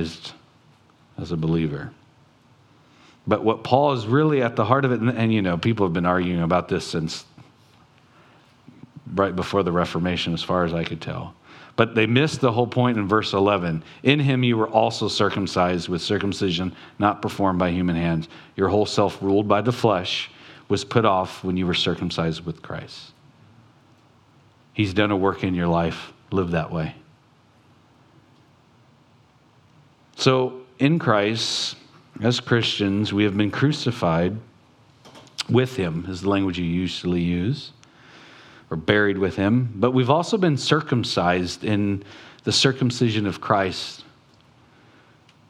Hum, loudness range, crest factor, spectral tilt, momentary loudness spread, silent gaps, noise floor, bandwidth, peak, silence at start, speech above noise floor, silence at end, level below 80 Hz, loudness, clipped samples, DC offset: none; 7 LU; 22 dB; -6 dB/octave; 12 LU; none; -56 dBFS; 12 kHz; 0 dBFS; 0 s; 35 dB; 1.45 s; -52 dBFS; -22 LUFS; under 0.1%; under 0.1%